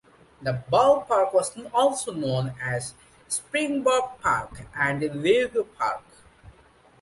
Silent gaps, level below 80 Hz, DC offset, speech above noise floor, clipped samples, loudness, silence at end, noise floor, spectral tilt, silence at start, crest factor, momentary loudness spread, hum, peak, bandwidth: none; -56 dBFS; under 0.1%; 32 dB; under 0.1%; -25 LUFS; 0.5 s; -56 dBFS; -4.5 dB/octave; 0.4 s; 18 dB; 10 LU; none; -6 dBFS; 11.5 kHz